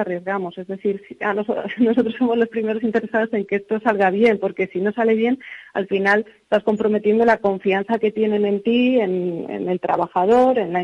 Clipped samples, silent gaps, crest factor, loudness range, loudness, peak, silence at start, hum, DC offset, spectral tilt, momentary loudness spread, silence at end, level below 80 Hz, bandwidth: under 0.1%; none; 14 dB; 2 LU; -20 LUFS; -6 dBFS; 0 s; none; under 0.1%; -7.5 dB/octave; 9 LU; 0 s; -62 dBFS; 7.6 kHz